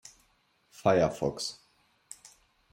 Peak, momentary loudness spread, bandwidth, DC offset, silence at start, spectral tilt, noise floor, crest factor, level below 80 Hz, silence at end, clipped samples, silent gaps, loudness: -10 dBFS; 24 LU; 16 kHz; under 0.1%; 0.8 s; -5 dB/octave; -70 dBFS; 24 dB; -62 dBFS; 1.2 s; under 0.1%; none; -29 LUFS